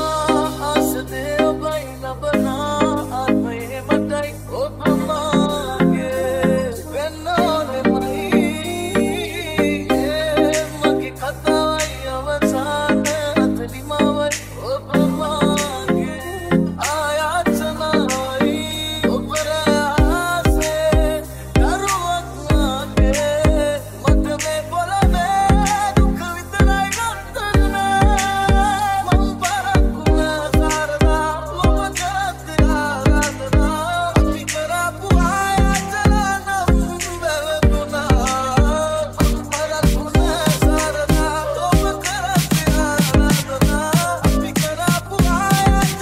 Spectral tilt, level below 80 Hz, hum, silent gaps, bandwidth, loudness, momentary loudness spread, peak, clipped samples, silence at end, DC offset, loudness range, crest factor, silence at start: -5 dB/octave; -24 dBFS; none; none; 16 kHz; -18 LUFS; 6 LU; -2 dBFS; under 0.1%; 0 s; under 0.1%; 2 LU; 16 dB; 0 s